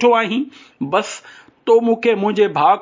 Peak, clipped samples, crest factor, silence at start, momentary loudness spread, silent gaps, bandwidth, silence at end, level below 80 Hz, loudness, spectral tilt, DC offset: -2 dBFS; under 0.1%; 14 dB; 0 s; 15 LU; none; 7.6 kHz; 0 s; -66 dBFS; -17 LUFS; -5 dB/octave; under 0.1%